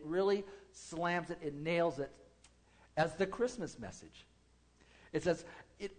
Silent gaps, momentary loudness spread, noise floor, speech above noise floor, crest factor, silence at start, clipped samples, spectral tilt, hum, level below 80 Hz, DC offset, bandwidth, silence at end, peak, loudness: none; 17 LU; -68 dBFS; 31 dB; 20 dB; 0 s; under 0.1%; -5.5 dB/octave; none; -66 dBFS; under 0.1%; 9.4 kHz; 0.05 s; -20 dBFS; -37 LUFS